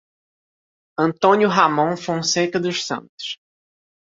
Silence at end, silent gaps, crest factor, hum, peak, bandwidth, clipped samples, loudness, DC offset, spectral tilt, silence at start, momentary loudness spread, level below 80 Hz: 0.8 s; 3.09-3.18 s; 20 dB; none; -2 dBFS; 7.8 kHz; under 0.1%; -19 LUFS; under 0.1%; -4 dB/octave; 1 s; 15 LU; -64 dBFS